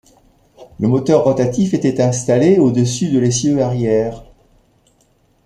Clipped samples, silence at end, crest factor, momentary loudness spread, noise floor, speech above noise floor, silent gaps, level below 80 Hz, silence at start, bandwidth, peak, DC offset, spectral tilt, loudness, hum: under 0.1%; 1.25 s; 14 dB; 5 LU; -57 dBFS; 43 dB; none; -46 dBFS; 0.6 s; 11.5 kHz; -2 dBFS; under 0.1%; -6.5 dB/octave; -15 LUFS; none